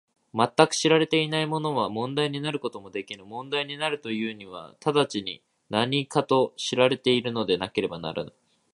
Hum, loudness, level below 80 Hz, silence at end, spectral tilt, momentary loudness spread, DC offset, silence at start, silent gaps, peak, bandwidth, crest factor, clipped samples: none; -26 LUFS; -66 dBFS; 0.45 s; -4.5 dB/octave; 14 LU; under 0.1%; 0.35 s; none; 0 dBFS; 11.5 kHz; 26 dB; under 0.1%